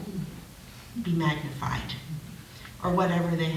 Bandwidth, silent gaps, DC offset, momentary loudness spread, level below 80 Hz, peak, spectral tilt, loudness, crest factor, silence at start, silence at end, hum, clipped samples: 16 kHz; none; under 0.1%; 19 LU; -50 dBFS; -10 dBFS; -6.5 dB/octave; -30 LUFS; 18 dB; 0 s; 0 s; none; under 0.1%